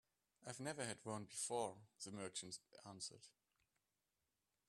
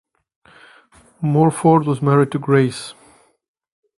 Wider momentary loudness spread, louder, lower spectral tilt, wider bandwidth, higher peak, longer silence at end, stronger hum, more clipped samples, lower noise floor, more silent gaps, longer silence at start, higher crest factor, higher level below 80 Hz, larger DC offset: first, 15 LU vs 11 LU; second, -49 LUFS vs -16 LUFS; second, -3 dB/octave vs -7.5 dB/octave; first, 13 kHz vs 11.5 kHz; second, -32 dBFS vs 0 dBFS; first, 1.4 s vs 1.05 s; neither; neither; first, under -90 dBFS vs -52 dBFS; neither; second, 0.4 s vs 1.2 s; about the same, 20 dB vs 18 dB; second, -88 dBFS vs -56 dBFS; neither